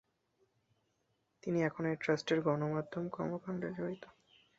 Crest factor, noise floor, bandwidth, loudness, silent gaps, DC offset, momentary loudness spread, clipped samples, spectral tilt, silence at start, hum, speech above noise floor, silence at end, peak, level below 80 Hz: 20 dB; -80 dBFS; 7.6 kHz; -37 LUFS; none; under 0.1%; 9 LU; under 0.1%; -5.5 dB/octave; 1.45 s; none; 44 dB; 0.5 s; -18 dBFS; -74 dBFS